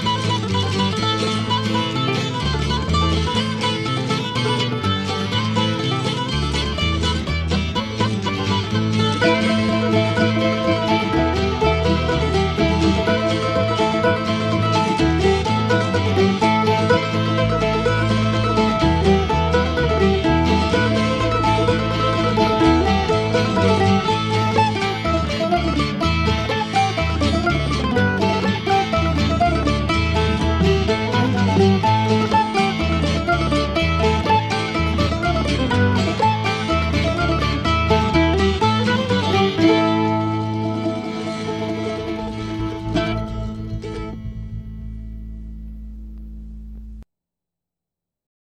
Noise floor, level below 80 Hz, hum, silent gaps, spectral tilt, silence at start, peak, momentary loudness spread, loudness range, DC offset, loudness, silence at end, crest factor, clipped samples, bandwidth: -86 dBFS; -30 dBFS; none; none; -6 dB/octave; 0 s; -2 dBFS; 9 LU; 7 LU; under 0.1%; -19 LUFS; 1.45 s; 16 dB; under 0.1%; 11.5 kHz